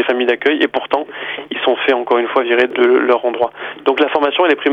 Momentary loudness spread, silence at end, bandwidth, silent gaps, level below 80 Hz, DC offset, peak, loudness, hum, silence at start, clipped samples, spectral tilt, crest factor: 7 LU; 0 s; 5.6 kHz; none; -62 dBFS; under 0.1%; -2 dBFS; -15 LUFS; none; 0 s; under 0.1%; -5 dB/octave; 14 dB